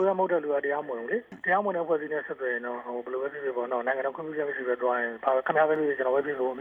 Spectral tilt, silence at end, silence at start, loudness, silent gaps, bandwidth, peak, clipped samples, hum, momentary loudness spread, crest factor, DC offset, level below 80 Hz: -8 dB/octave; 0 s; 0 s; -28 LUFS; none; 3.8 kHz; -10 dBFS; under 0.1%; none; 8 LU; 18 dB; under 0.1%; -76 dBFS